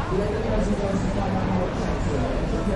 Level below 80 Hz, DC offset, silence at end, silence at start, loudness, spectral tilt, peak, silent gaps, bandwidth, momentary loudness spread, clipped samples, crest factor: -30 dBFS; under 0.1%; 0 s; 0 s; -25 LUFS; -7 dB/octave; -10 dBFS; none; 11 kHz; 2 LU; under 0.1%; 14 dB